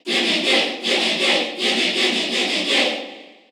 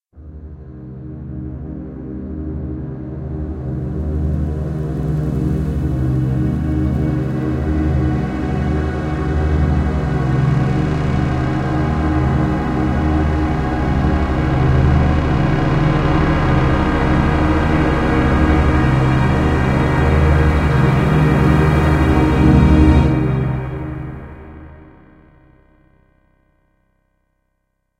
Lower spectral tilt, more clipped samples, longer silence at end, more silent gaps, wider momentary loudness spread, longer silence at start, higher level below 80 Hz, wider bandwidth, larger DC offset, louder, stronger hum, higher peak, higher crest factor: second, -1.5 dB/octave vs -8.5 dB/octave; neither; second, 0.25 s vs 3.15 s; neither; second, 3 LU vs 15 LU; about the same, 0.05 s vs 0.15 s; second, -82 dBFS vs -22 dBFS; first, over 20 kHz vs 9.4 kHz; neither; about the same, -18 LUFS vs -16 LUFS; neither; second, -4 dBFS vs 0 dBFS; about the same, 16 dB vs 16 dB